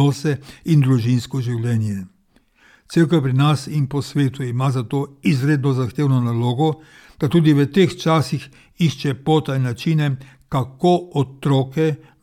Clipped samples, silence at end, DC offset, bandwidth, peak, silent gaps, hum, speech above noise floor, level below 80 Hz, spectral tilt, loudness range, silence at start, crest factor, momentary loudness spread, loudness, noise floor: under 0.1%; 0.25 s; under 0.1%; 14 kHz; -4 dBFS; none; none; 40 dB; -54 dBFS; -7 dB/octave; 2 LU; 0 s; 14 dB; 8 LU; -19 LUFS; -58 dBFS